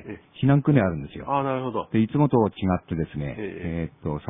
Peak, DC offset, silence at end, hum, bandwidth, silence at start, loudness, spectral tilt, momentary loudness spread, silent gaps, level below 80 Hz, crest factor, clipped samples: -4 dBFS; under 0.1%; 0 s; none; 3.8 kHz; 0 s; -24 LUFS; -12 dB/octave; 11 LU; none; -48 dBFS; 20 dB; under 0.1%